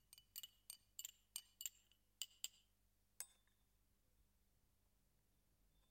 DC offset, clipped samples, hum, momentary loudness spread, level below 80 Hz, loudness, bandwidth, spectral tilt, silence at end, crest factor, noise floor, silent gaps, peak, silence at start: under 0.1%; under 0.1%; 50 Hz at -85 dBFS; 6 LU; -84 dBFS; -55 LUFS; 16.5 kHz; 2 dB/octave; 0.1 s; 34 dB; -82 dBFS; none; -28 dBFS; 0.1 s